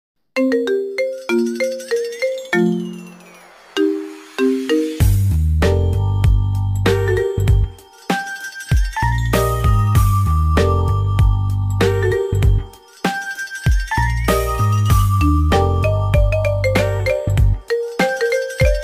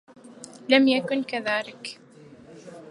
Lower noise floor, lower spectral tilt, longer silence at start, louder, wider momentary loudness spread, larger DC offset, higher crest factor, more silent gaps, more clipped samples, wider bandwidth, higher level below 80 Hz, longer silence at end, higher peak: second, -43 dBFS vs -49 dBFS; first, -6.5 dB/octave vs -4 dB/octave; about the same, 0.35 s vs 0.25 s; first, -18 LUFS vs -23 LUFS; second, 7 LU vs 26 LU; neither; second, 12 dB vs 24 dB; neither; neither; first, 16 kHz vs 11.5 kHz; first, -22 dBFS vs -74 dBFS; about the same, 0 s vs 0.05 s; about the same, -4 dBFS vs -2 dBFS